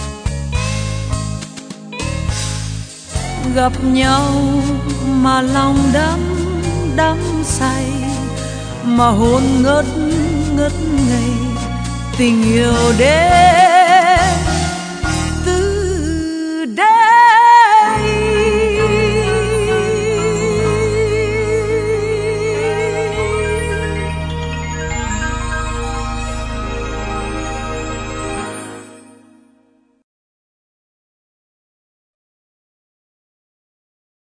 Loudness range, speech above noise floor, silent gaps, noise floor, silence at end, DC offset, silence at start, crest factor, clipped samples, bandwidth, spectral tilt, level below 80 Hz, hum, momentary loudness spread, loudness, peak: 12 LU; 43 dB; none; -56 dBFS; 5.4 s; under 0.1%; 0 s; 16 dB; under 0.1%; 10 kHz; -5 dB/octave; -28 dBFS; none; 14 LU; -15 LUFS; 0 dBFS